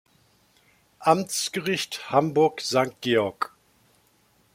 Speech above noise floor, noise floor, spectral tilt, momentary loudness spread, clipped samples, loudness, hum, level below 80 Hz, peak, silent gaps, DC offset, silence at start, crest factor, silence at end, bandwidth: 39 dB; -63 dBFS; -4 dB/octave; 6 LU; under 0.1%; -24 LUFS; none; -68 dBFS; -4 dBFS; none; under 0.1%; 1 s; 22 dB; 1.05 s; 16.5 kHz